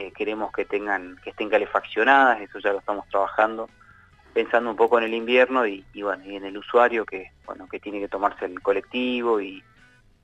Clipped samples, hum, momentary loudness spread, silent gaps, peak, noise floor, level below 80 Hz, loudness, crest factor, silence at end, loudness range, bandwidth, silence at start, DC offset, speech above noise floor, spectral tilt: under 0.1%; none; 16 LU; none; -4 dBFS; -56 dBFS; -60 dBFS; -23 LUFS; 20 dB; 0.65 s; 4 LU; 8 kHz; 0 s; under 0.1%; 32 dB; -5 dB/octave